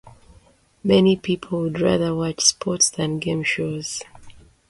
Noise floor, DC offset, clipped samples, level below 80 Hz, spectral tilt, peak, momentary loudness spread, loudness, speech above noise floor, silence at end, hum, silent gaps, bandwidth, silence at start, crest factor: -54 dBFS; under 0.1%; under 0.1%; -52 dBFS; -3.5 dB/octave; -2 dBFS; 11 LU; -20 LUFS; 34 dB; 0.35 s; none; none; 11.5 kHz; 0.05 s; 20 dB